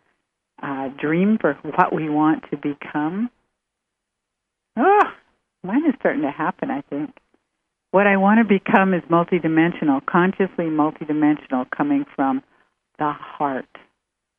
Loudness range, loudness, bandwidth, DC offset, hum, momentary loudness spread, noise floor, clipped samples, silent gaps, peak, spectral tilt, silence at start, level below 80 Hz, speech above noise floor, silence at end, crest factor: 6 LU; -20 LUFS; 3.7 kHz; under 0.1%; none; 12 LU; -80 dBFS; under 0.1%; none; -2 dBFS; -9.5 dB/octave; 0.6 s; -64 dBFS; 61 dB; 0.8 s; 20 dB